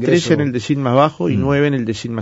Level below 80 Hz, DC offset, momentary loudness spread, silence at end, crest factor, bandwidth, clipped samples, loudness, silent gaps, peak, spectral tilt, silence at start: -44 dBFS; under 0.1%; 5 LU; 0 s; 16 dB; 8 kHz; under 0.1%; -16 LUFS; none; 0 dBFS; -6.5 dB/octave; 0 s